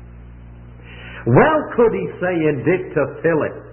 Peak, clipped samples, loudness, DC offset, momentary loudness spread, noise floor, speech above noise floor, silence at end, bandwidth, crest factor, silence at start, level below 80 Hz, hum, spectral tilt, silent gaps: 0 dBFS; under 0.1%; -18 LUFS; under 0.1%; 15 LU; -38 dBFS; 21 dB; 0 s; 3.2 kHz; 18 dB; 0 s; -42 dBFS; none; -12.5 dB/octave; none